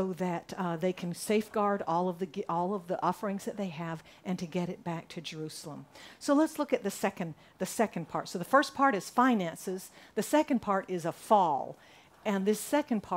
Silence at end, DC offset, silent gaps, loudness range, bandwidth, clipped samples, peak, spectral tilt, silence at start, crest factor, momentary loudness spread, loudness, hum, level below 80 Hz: 0 s; under 0.1%; none; 6 LU; 16 kHz; under 0.1%; -10 dBFS; -5.5 dB/octave; 0 s; 20 dB; 13 LU; -32 LUFS; none; -72 dBFS